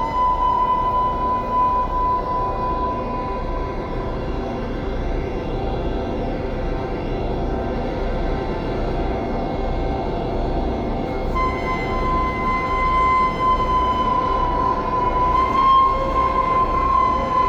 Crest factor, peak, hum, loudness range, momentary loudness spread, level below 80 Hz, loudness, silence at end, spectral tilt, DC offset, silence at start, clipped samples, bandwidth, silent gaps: 12 dB; -8 dBFS; none; 8 LU; 8 LU; -28 dBFS; -21 LUFS; 0 s; -7.5 dB/octave; under 0.1%; 0 s; under 0.1%; 7.6 kHz; none